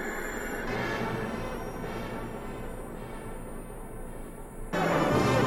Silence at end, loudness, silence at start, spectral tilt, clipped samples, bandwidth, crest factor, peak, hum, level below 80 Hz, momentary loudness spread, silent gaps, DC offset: 0 s; -33 LUFS; 0 s; -5.5 dB/octave; under 0.1%; 18 kHz; 18 dB; -14 dBFS; none; -42 dBFS; 17 LU; none; under 0.1%